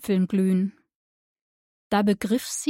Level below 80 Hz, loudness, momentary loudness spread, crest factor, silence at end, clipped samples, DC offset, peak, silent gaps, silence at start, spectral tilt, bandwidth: -62 dBFS; -24 LUFS; 4 LU; 14 dB; 0 s; under 0.1%; under 0.1%; -10 dBFS; 0.95-1.90 s; 0 s; -5.5 dB/octave; 16.5 kHz